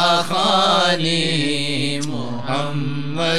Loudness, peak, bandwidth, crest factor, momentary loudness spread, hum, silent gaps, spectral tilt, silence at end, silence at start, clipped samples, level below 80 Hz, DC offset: -19 LUFS; -4 dBFS; 14.5 kHz; 16 dB; 10 LU; none; none; -4 dB/octave; 0 s; 0 s; under 0.1%; -60 dBFS; 4%